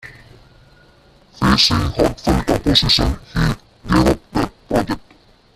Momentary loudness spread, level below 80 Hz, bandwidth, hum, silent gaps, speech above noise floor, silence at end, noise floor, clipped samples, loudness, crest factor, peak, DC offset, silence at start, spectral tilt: 10 LU; -30 dBFS; 14.5 kHz; none; none; 34 dB; 0.55 s; -50 dBFS; under 0.1%; -17 LUFS; 18 dB; 0 dBFS; under 0.1%; 0.05 s; -5 dB/octave